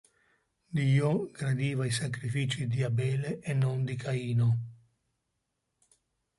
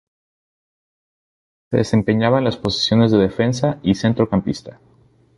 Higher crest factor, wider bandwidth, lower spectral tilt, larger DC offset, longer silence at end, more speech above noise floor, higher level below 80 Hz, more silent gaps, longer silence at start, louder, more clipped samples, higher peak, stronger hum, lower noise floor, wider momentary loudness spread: about the same, 16 dB vs 18 dB; about the same, 11.5 kHz vs 11.5 kHz; about the same, -6.5 dB/octave vs -6.5 dB/octave; neither; first, 1.65 s vs 0.65 s; second, 53 dB vs over 73 dB; second, -64 dBFS vs -46 dBFS; neither; second, 0.7 s vs 1.7 s; second, -30 LUFS vs -18 LUFS; neither; second, -16 dBFS vs -2 dBFS; neither; second, -82 dBFS vs under -90 dBFS; about the same, 6 LU vs 6 LU